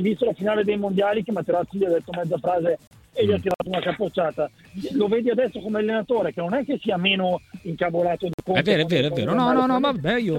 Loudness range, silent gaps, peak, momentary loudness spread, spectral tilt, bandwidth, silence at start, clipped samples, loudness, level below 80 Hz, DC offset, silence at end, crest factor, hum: 3 LU; 2.87-2.91 s, 8.34-8.38 s; -6 dBFS; 7 LU; -7 dB/octave; 16.5 kHz; 0 s; under 0.1%; -23 LUFS; -56 dBFS; under 0.1%; 0 s; 16 dB; none